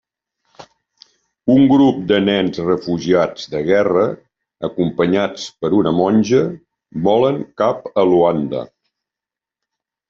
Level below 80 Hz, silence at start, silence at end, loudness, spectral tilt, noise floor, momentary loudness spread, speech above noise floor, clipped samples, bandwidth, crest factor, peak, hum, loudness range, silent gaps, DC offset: -54 dBFS; 0.6 s; 1.45 s; -16 LUFS; -5.5 dB/octave; -87 dBFS; 11 LU; 72 dB; under 0.1%; 7.4 kHz; 14 dB; -2 dBFS; none; 3 LU; none; under 0.1%